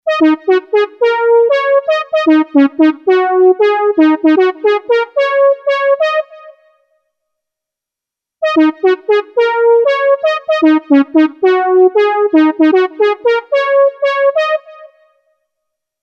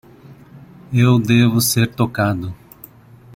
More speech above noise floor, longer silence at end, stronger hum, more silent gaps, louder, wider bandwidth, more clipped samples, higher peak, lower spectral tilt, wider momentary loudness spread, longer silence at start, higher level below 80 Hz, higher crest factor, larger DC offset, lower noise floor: first, 74 dB vs 29 dB; first, 1.15 s vs 0.8 s; neither; neither; first, -11 LUFS vs -16 LUFS; second, 6.6 kHz vs 17 kHz; neither; about the same, 0 dBFS vs -2 dBFS; about the same, -4.5 dB/octave vs -5.5 dB/octave; second, 5 LU vs 13 LU; second, 0.05 s vs 0.3 s; second, -72 dBFS vs -50 dBFS; about the same, 12 dB vs 16 dB; neither; first, -84 dBFS vs -44 dBFS